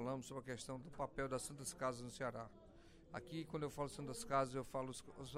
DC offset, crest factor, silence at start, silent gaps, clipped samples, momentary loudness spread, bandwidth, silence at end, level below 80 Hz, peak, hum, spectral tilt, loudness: under 0.1%; 20 dB; 0 s; none; under 0.1%; 13 LU; 16 kHz; 0 s; -66 dBFS; -26 dBFS; none; -4.5 dB/octave; -46 LUFS